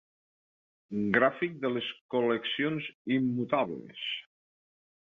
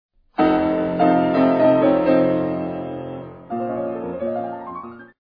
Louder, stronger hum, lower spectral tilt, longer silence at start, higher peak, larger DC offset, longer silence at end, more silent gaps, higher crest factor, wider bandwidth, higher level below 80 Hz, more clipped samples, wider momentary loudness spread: second, -31 LUFS vs -19 LUFS; neither; second, -7.5 dB/octave vs -10 dB/octave; first, 0.9 s vs 0.4 s; second, -10 dBFS vs -4 dBFS; neither; first, 0.85 s vs 0.15 s; first, 2.01-2.09 s, 2.94-3.05 s vs none; first, 22 dB vs 16 dB; about the same, 4.8 kHz vs 5.2 kHz; second, -72 dBFS vs -52 dBFS; neither; second, 10 LU vs 16 LU